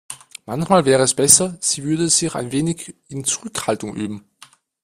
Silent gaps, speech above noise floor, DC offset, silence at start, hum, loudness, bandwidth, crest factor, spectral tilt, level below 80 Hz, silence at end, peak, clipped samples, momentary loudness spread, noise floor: none; 31 dB; under 0.1%; 0.1 s; none; -17 LUFS; 16 kHz; 20 dB; -3.5 dB/octave; -54 dBFS; 0.65 s; 0 dBFS; under 0.1%; 18 LU; -50 dBFS